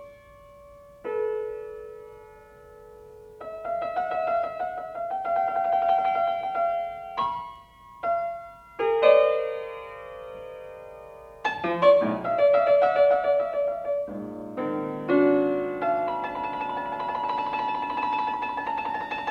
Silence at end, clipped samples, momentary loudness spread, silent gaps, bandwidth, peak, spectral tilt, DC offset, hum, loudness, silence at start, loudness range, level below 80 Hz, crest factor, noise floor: 0 s; under 0.1%; 20 LU; none; 6.6 kHz; -6 dBFS; -6.5 dB/octave; under 0.1%; none; -25 LUFS; 0 s; 10 LU; -62 dBFS; 20 dB; -50 dBFS